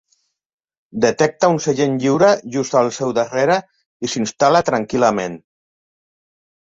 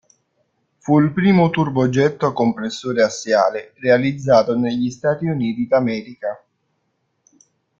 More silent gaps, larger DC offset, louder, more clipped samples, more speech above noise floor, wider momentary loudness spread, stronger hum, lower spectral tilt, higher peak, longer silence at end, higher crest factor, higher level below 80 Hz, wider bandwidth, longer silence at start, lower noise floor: first, 3.86-4.00 s vs none; neither; about the same, -17 LUFS vs -18 LUFS; neither; about the same, 49 dB vs 52 dB; about the same, 10 LU vs 10 LU; neither; second, -5 dB/octave vs -6.5 dB/octave; about the same, -2 dBFS vs -2 dBFS; second, 1.25 s vs 1.45 s; about the same, 16 dB vs 16 dB; about the same, -58 dBFS vs -58 dBFS; about the same, 7.8 kHz vs 7.6 kHz; about the same, 0.95 s vs 0.85 s; second, -66 dBFS vs -70 dBFS